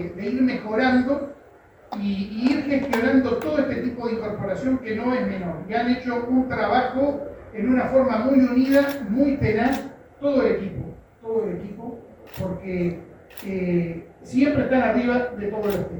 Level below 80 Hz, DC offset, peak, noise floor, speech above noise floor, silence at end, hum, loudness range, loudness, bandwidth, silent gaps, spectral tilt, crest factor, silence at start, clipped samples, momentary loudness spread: -48 dBFS; under 0.1%; -6 dBFS; -50 dBFS; 28 dB; 0 s; none; 6 LU; -23 LUFS; over 20 kHz; none; -7.5 dB/octave; 16 dB; 0 s; under 0.1%; 15 LU